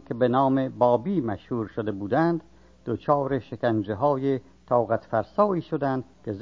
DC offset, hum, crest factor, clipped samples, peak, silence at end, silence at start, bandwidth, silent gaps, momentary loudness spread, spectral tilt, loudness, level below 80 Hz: 0.1%; none; 18 dB; under 0.1%; -8 dBFS; 0 s; 0.1 s; 6.8 kHz; none; 9 LU; -9.5 dB/octave; -25 LUFS; -56 dBFS